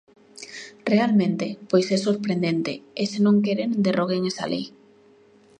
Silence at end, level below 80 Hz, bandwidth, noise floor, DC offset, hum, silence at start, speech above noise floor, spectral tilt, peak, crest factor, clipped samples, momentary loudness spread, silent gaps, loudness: 0.9 s; -70 dBFS; 9.6 kHz; -54 dBFS; under 0.1%; none; 0.4 s; 32 dB; -6 dB/octave; -6 dBFS; 16 dB; under 0.1%; 15 LU; none; -23 LUFS